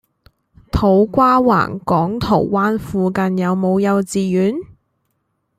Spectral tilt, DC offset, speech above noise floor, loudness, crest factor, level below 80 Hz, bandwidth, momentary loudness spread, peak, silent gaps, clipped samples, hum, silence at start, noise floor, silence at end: -7 dB/octave; under 0.1%; 54 dB; -16 LUFS; 16 dB; -38 dBFS; 14.5 kHz; 6 LU; -2 dBFS; none; under 0.1%; none; 0.75 s; -69 dBFS; 0.9 s